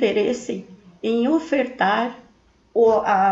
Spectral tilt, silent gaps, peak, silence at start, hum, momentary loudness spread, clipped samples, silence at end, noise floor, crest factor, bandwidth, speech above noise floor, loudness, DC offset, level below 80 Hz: -5.5 dB/octave; none; -6 dBFS; 0 s; none; 12 LU; under 0.1%; 0 s; -56 dBFS; 14 dB; 8 kHz; 37 dB; -21 LUFS; under 0.1%; -60 dBFS